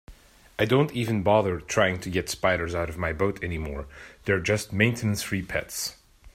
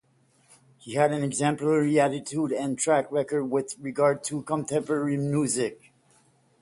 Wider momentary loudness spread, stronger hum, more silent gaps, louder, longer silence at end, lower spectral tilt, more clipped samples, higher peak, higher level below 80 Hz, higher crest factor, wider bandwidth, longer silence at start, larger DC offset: first, 11 LU vs 6 LU; neither; neither; about the same, -26 LUFS vs -26 LUFS; second, 0.05 s vs 0.85 s; about the same, -5 dB/octave vs -5.5 dB/octave; neither; about the same, -6 dBFS vs -8 dBFS; first, -48 dBFS vs -68 dBFS; about the same, 20 dB vs 18 dB; first, 16 kHz vs 11.5 kHz; second, 0.1 s vs 0.85 s; neither